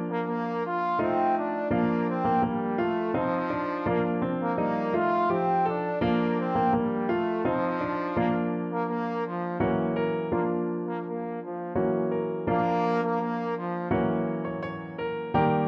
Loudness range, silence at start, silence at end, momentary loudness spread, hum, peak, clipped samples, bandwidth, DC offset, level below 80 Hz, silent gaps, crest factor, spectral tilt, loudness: 3 LU; 0 s; 0 s; 6 LU; none; -12 dBFS; under 0.1%; 6.2 kHz; under 0.1%; -56 dBFS; none; 16 dB; -9.5 dB/octave; -27 LUFS